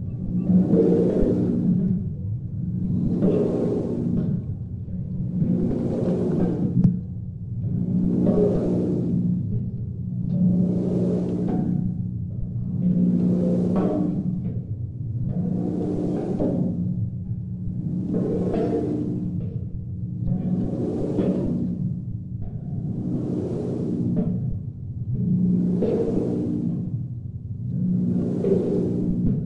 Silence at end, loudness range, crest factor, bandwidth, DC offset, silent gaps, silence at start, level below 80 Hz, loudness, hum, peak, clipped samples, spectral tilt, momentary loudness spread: 0 s; 4 LU; 18 dB; 3.6 kHz; under 0.1%; none; 0 s; -42 dBFS; -24 LUFS; none; -6 dBFS; under 0.1%; -11.5 dB/octave; 10 LU